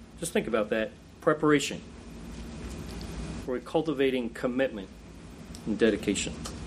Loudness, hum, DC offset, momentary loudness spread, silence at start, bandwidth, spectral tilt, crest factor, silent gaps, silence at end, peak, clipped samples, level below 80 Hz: -29 LUFS; none; under 0.1%; 19 LU; 0 s; 15.5 kHz; -4.5 dB/octave; 20 dB; none; 0 s; -10 dBFS; under 0.1%; -48 dBFS